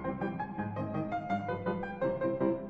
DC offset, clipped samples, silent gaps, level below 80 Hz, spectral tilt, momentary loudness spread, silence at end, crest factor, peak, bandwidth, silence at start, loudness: under 0.1%; under 0.1%; none; -58 dBFS; -9.5 dB/octave; 5 LU; 0 s; 16 dB; -18 dBFS; 6.6 kHz; 0 s; -35 LUFS